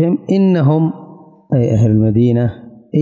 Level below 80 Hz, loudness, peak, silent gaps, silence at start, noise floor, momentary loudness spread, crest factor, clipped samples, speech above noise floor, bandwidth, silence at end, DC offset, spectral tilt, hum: -42 dBFS; -14 LUFS; -4 dBFS; none; 0 s; -38 dBFS; 8 LU; 10 dB; under 0.1%; 26 dB; 7.4 kHz; 0 s; under 0.1%; -10 dB/octave; none